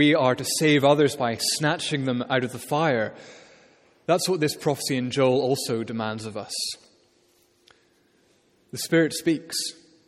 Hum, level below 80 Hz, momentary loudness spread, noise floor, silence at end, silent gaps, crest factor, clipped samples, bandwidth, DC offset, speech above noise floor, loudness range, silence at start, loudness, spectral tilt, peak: none; -68 dBFS; 12 LU; -63 dBFS; 0.35 s; none; 20 dB; under 0.1%; 16 kHz; under 0.1%; 39 dB; 7 LU; 0 s; -24 LUFS; -4 dB/octave; -4 dBFS